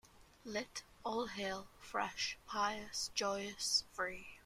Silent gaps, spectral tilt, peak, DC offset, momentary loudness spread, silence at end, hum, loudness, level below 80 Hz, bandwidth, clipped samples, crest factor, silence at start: none; -1.5 dB/octave; -22 dBFS; under 0.1%; 10 LU; 0.05 s; none; -40 LUFS; -68 dBFS; 16 kHz; under 0.1%; 20 dB; 0.05 s